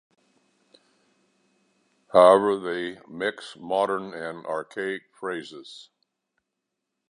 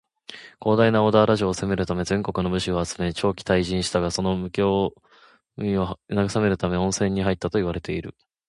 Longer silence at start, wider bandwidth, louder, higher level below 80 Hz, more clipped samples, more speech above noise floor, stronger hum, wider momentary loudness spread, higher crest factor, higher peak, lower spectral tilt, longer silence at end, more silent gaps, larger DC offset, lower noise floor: first, 2.15 s vs 0.3 s; about the same, 11 kHz vs 11.5 kHz; about the same, -24 LUFS vs -23 LUFS; second, -70 dBFS vs -44 dBFS; neither; first, 59 dB vs 22 dB; neither; first, 23 LU vs 11 LU; first, 24 dB vs 18 dB; about the same, -2 dBFS vs -4 dBFS; about the same, -5 dB/octave vs -5.5 dB/octave; first, 1.3 s vs 0.4 s; neither; neither; first, -83 dBFS vs -44 dBFS